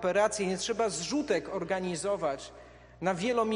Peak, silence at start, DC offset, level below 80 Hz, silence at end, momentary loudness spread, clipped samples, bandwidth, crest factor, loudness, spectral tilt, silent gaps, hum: -12 dBFS; 0 s; under 0.1%; -60 dBFS; 0 s; 6 LU; under 0.1%; 10 kHz; 18 dB; -31 LUFS; -4 dB/octave; none; none